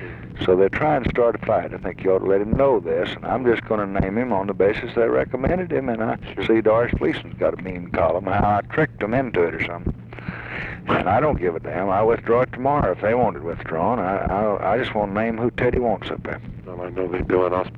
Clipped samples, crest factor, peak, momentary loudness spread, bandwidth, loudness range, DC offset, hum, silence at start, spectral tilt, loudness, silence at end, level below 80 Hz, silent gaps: under 0.1%; 16 dB; -6 dBFS; 11 LU; 5.6 kHz; 2 LU; under 0.1%; none; 0 s; -9 dB/octave; -21 LUFS; 0 s; -40 dBFS; none